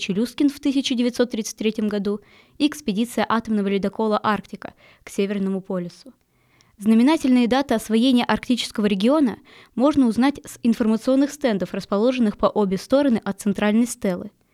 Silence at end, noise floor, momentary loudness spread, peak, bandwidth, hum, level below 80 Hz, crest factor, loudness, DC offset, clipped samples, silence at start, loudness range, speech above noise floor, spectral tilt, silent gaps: 0.25 s; -59 dBFS; 9 LU; -6 dBFS; 14.5 kHz; none; -54 dBFS; 16 dB; -21 LUFS; under 0.1%; under 0.1%; 0 s; 5 LU; 39 dB; -5.5 dB/octave; none